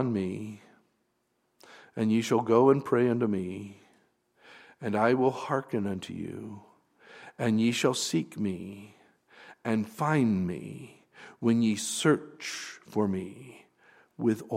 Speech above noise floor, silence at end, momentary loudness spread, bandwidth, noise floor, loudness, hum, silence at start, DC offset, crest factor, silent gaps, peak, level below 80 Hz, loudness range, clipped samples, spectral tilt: 47 dB; 0 s; 19 LU; 15.5 kHz; -75 dBFS; -29 LUFS; none; 0 s; under 0.1%; 20 dB; none; -10 dBFS; -72 dBFS; 4 LU; under 0.1%; -5.5 dB/octave